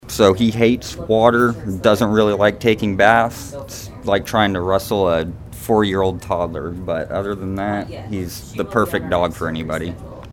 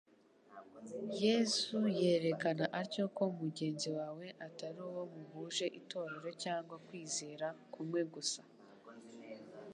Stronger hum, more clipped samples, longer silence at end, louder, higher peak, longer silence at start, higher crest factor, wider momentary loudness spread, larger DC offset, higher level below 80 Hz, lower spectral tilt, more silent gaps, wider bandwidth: neither; neither; about the same, 0 s vs 0 s; first, -18 LUFS vs -39 LUFS; first, 0 dBFS vs -20 dBFS; second, 0.05 s vs 0.5 s; about the same, 18 dB vs 20 dB; second, 13 LU vs 19 LU; neither; first, -40 dBFS vs -88 dBFS; first, -5.5 dB/octave vs -4 dB/octave; neither; first, 18 kHz vs 11 kHz